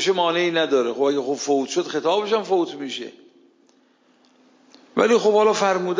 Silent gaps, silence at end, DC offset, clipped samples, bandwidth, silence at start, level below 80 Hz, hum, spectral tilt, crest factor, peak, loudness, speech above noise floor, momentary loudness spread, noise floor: none; 0 s; under 0.1%; under 0.1%; 7.6 kHz; 0 s; -76 dBFS; none; -3.5 dB/octave; 16 dB; -6 dBFS; -21 LUFS; 39 dB; 11 LU; -59 dBFS